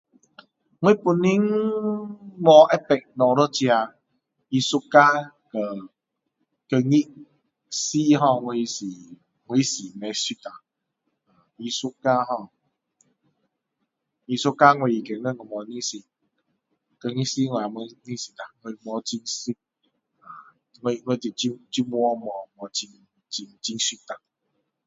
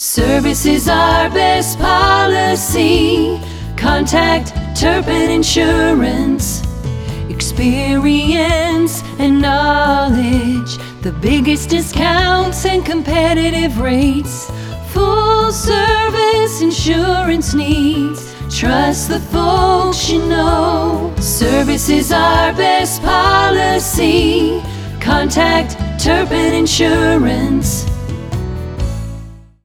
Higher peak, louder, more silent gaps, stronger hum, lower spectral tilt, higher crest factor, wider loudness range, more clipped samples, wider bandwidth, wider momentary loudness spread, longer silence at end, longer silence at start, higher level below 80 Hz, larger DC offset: about the same, 0 dBFS vs 0 dBFS; second, -23 LUFS vs -13 LUFS; neither; neither; about the same, -4.5 dB/octave vs -4.5 dB/octave; first, 24 dB vs 14 dB; first, 11 LU vs 2 LU; neither; second, 8 kHz vs 18.5 kHz; first, 19 LU vs 10 LU; first, 0.7 s vs 0.2 s; first, 0.8 s vs 0 s; second, -72 dBFS vs -24 dBFS; neither